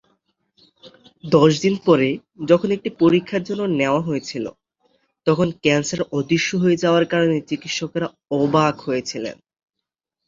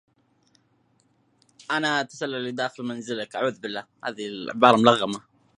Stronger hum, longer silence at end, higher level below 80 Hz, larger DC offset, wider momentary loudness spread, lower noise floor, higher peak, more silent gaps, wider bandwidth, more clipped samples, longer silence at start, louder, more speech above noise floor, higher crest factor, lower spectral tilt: neither; first, 0.95 s vs 0.4 s; first, -58 dBFS vs -72 dBFS; neither; second, 10 LU vs 16 LU; first, -83 dBFS vs -66 dBFS; about the same, -2 dBFS vs 0 dBFS; neither; second, 7.6 kHz vs 11 kHz; neither; second, 0.85 s vs 1.7 s; first, -20 LUFS vs -24 LUFS; first, 64 dB vs 42 dB; second, 18 dB vs 26 dB; about the same, -5.5 dB/octave vs -4.5 dB/octave